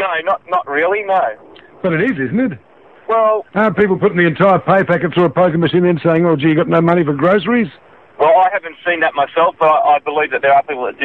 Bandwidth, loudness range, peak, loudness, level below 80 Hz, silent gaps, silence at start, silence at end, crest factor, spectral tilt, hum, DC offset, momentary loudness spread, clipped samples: 4.4 kHz; 4 LU; 0 dBFS; -14 LUFS; -52 dBFS; none; 0 s; 0 s; 14 dB; -9 dB/octave; none; 0.2%; 6 LU; under 0.1%